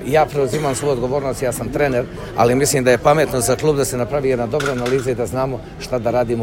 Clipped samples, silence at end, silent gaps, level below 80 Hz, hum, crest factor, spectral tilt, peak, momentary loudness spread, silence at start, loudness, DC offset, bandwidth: under 0.1%; 0 s; none; -38 dBFS; none; 18 dB; -5 dB/octave; 0 dBFS; 8 LU; 0 s; -18 LUFS; under 0.1%; 16.5 kHz